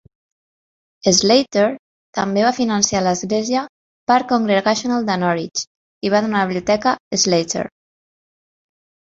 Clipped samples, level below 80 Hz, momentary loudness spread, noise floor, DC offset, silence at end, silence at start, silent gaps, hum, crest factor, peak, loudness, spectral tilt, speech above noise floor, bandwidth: under 0.1%; -56 dBFS; 11 LU; under -90 dBFS; under 0.1%; 1.5 s; 1.05 s; 1.79-2.13 s, 3.69-4.07 s, 5.67-6.01 s, 7.00-7.11 s; none; 18 dB; 0 dBFS; -18 LUFS; -3.5 dB/octave; over 73 dB; 8 kHz